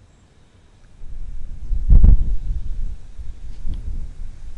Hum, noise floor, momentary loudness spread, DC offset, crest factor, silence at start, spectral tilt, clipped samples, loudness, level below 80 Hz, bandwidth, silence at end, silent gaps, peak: none; -51 dBFS; 23 LU; under 0.1%; 14 dB; 1 s; -9.5 dB/octave; under 0.1%; -22 LUFS; -18 dBFS; 1.6 kHz; 0 s; none; -4 dBFS